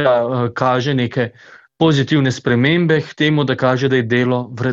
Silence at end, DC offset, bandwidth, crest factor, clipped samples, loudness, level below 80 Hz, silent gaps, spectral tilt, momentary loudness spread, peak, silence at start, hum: 0 s; under 0.1%; 7.8 kHz; 14 dB; under 0.1%; -16 LUFS; -52 dBFS; none; -6.5 dB/octave; 5 LU; -2 dBFS; 0 s; none